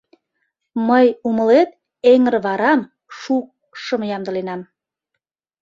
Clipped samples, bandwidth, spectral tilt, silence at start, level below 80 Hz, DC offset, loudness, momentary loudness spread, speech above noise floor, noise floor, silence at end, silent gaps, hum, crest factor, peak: under 0.1%; 7.4 kHz; -6.5 dB/octave; 0.75 s; -66 dBFS; under 0.1%; -17 LUFS; 17 LU; 63 dB; -79 dBFS; 1 s; none; none; 16 dB; -2 dBFS